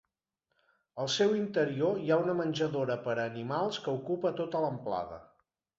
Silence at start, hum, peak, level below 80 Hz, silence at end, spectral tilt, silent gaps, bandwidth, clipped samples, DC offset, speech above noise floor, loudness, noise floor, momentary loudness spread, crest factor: 0.95 s; none; -14 dBFS; -70 dBFS; 0.55 s; -5.5 dB/octave; none; 8 kHz; under 0.1%; under 0.1%; 53 dB; -32 LUFS; -84 dBFS; 8 LU; 18 dB